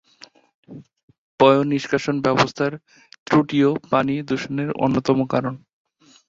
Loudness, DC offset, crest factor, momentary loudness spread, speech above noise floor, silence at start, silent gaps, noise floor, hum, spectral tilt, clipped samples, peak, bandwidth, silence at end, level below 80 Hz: -20 LUFS; under 0.1%; 20 dB; 10 LU; 30 dB; 0.7 s; 1.03-1.08 s, 1.18-1.38 s, 3.19-3.26 s; -50 dBFS; none; -6.5 dB/octave; under 0.1%; -2 dBFS; 7.8 kHz; 0.7 s; -58 dBFS